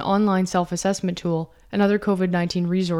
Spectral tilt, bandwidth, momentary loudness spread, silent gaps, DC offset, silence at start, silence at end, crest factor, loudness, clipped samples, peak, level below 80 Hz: -6 dB/octave; 12.5 kHz; 6 LU; none; under 0.1%; 0 s; 0 s; 14 dB; -22 LUFS; under 0.1%; -8 dBFS; -52 dBFS